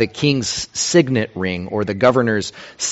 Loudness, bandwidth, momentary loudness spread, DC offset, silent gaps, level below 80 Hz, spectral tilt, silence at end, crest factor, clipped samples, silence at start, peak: -18 LUFS; 8.2 kHz; 8 LU; under 0.1%; none; -50 dBFS; -4 dB/octave; 0 s; 18 dB; under 0.1%; 0 s; 0 dBFS